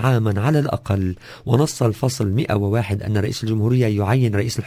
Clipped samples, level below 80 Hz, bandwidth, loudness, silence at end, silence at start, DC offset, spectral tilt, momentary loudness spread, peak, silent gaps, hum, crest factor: under 0.1%; -40 dBFS; 16 kHz; -20 LUFS; 0 s; 0 s; under 0.1%; -6.5 dB/octave; 4 LU; -2 dBFS; none; none; 18 dB